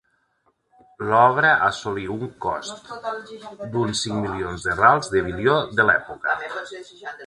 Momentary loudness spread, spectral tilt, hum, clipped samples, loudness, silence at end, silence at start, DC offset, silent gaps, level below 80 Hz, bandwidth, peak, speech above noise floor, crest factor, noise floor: 17 LU; -4.5 dB/octave; none; under 0.1%; -21 LUFS; 0 s; 1 s; under 0.1%; none; -50 dBFS; 11.5 kHz; -2 dBFS; 45 dB; 22 dB; -67 dBFS